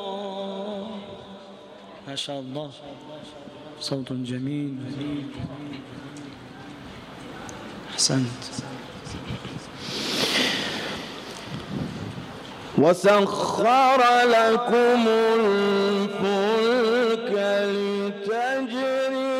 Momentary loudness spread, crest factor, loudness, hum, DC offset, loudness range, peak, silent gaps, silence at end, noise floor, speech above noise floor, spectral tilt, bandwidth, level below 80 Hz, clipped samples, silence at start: 22 LU; 18 dB; -23 LUFS; none; under 0.1%; 15 LU; -8 dBFS; none; 0 s; -44 dBFS; 22 dB; -4 dB/octave; 15.5 kHz; -58 dBFS; under 0.1%; 0 s